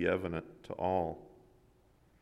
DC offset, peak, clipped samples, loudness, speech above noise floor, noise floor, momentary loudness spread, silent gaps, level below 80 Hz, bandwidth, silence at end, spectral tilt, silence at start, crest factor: under 0.1%; -18 dBFS; under 0.1%; -36 LUFS; 31 dB; -67 dBFS; 13 LU; none; -62 dBFS; 13 kHz; 0.95 s; -8 dB/octave; 0 s; 20 dB